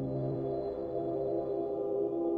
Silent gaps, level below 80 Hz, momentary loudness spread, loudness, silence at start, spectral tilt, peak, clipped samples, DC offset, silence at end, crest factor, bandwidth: none; -60 dBFS; 3 LU; -34 LUFS; 0 s; -11.5 dB/octave; -24 dBFS; under 0.1%; under 0.1%; 0 s; 10 dB; 4.4 kHz